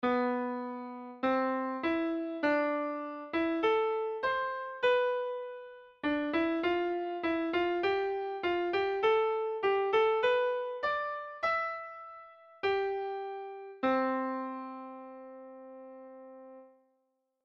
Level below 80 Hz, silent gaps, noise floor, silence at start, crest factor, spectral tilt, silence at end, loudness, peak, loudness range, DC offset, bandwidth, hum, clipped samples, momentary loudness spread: -68 dBFS; none; -79 dBFS; 0 s; 16 dB; -5.5 dB/octave; 0.8 s; -32 LUFS; -18 dBFS; 7 LU; under 0.1%; 7 kHz; none; under 0.1%; 19 LU